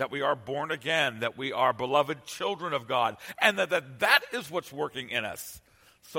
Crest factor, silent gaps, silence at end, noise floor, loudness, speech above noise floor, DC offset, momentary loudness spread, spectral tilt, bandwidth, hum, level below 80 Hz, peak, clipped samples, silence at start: 24 dB; none; 0 s; -56 dBFS; -28 LUFS; 27 dB; under 0.1%; 10 LU; -3 dB/octave; 16.5 kHz; none; -68 dBFS; -4 dBFS; under 0.1%; 0 s